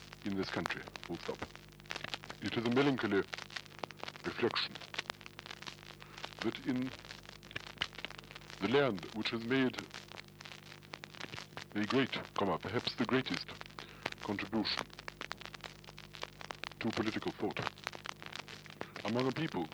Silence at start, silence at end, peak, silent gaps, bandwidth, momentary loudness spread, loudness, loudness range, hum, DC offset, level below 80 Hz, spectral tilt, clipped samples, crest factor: 0 s; 0 s; -16 dBFS; none; over 20 kHz; 16 LU; -38 LUFS; 5 LU; 50 Hz at -60 dBFS; under 0.1%; -66 dBFS; -5 dB/octave; under 0.1%; 24 dB